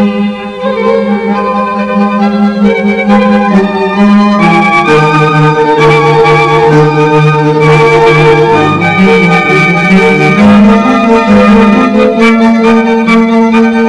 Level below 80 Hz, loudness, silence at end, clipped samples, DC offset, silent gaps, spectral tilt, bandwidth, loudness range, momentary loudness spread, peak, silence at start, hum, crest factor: -36 dBFS; -6 LUFS; 0 s; 8%; under 0.1%; none; -7 dB/octave; 11 kHz; 3 LU; 6 LU; 0 dBFS; 0 s; none; 6 dB